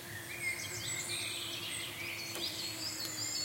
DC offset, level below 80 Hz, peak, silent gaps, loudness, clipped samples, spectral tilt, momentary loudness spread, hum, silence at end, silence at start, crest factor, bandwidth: under 0.1%; -70 dBFS; -22 dBFS; none; -37 LUFS; under 0.1%; -1 dB/octave; 3 LU; none; 0 s; 0 s; 18 dB; 16.5 kHz